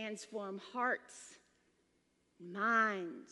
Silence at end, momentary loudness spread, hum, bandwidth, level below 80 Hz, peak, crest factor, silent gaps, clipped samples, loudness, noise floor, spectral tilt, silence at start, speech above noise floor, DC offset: 0 s; 22 LU; none; 11.5 kHz; -90 dBFS; -20 dBFS; 20 dB; none; under 0.1%; -37 LUFS; -77 dBFS; -4 dB/octave; 0 s; 39 dB; under 0.1%